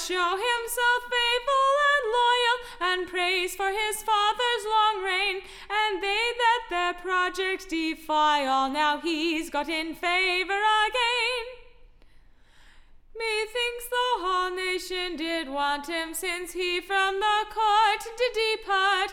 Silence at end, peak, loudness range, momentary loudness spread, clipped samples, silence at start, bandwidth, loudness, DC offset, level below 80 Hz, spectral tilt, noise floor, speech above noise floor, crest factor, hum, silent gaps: 0 s; -10 dBFS; 5 LU; 7 LU; under 0.1%; 0 s; 17.5 kHz; -25 LUFS; under 0.1%; -52 dBFS; -0.5 dB/octave; -53 dBFS; 27 dB; 16 dB; none; none